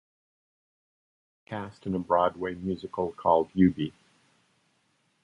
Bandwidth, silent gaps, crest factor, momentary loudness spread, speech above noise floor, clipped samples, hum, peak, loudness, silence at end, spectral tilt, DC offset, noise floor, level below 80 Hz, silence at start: 7.4 kHz; none; 22 dB; 13 LU; 44 dB; under 0.1%; none; -8 dBFS; -28 LUFS; 1.35 s; -9 dB/octave; under 0.1%; -71 dBFS; -56 dBFS; 1.5 s